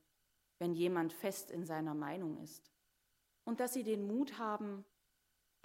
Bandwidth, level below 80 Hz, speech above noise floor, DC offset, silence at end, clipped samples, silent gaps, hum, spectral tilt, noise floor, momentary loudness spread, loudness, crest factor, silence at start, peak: 16 kHz; -88 dBFS; 41 dB; under 0.1%; 0.8 s; under 0.1%; none; none; -5.5 dB/octave; -80 dBFS; 13 LU; -40 LUFS; 18 dB; 0.6 s; -24 dBFS